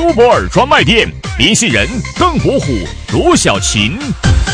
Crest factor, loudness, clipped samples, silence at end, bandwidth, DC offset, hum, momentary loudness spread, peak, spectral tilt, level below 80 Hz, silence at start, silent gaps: 10 dB; -11 LUFS; 0.1%; 0 s; 11 kHz; under 0.1%; none; 8 LU; 0 dBFS; -4 dB/octave; -22 dBFS; 0 s; none